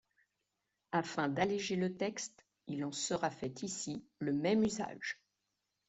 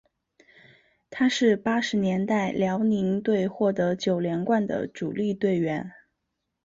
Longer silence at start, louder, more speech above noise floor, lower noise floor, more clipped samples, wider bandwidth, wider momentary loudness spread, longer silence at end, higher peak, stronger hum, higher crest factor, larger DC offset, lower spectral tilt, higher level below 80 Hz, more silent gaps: second, 0.9 s vs 1.1 s; second, -37 LUFS vs -25 LUFS; second, 50 dB vs 56 dB; first, -86 dBFS vs -80 dBFS; neither; about the same, 8.2 kHz vs 7.8 kHz; first, 11 LU vs 7 LU; about the same, 0.75 s vs 0.75 s; second, -18 dBFS vs -10 dBFS; neither; about the same, 20 dB vs 16 dB; neither; second, -4.5 dB/octave vs -6 dB/octave; second, -72 dBFS vs -64 dBFS; neither